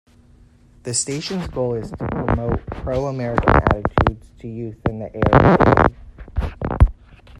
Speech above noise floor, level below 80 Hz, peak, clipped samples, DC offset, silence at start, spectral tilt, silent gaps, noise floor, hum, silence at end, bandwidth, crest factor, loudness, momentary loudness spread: 31 dB; -28 dBFS; 0 dBFS; under 0.1%; under 0.1%; 0.85 s; -6 dB/octave; none; -50 dBFS; none; 0.05 s; 11 kHz; 20 dB; -19 LUFS; 14 LU